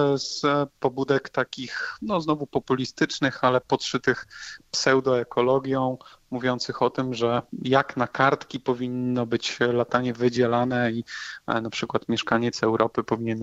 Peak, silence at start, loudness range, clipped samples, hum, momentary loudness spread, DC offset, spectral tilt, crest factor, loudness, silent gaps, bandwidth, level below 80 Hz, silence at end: -6 dBFS; 0 s; 2 LU; under 0.1%; none; 7 LU; under 0.1%; -5 dB/octave; 20 dB; -25 LUFS; none; 8.2 kHz; -60 dBFS; 0 s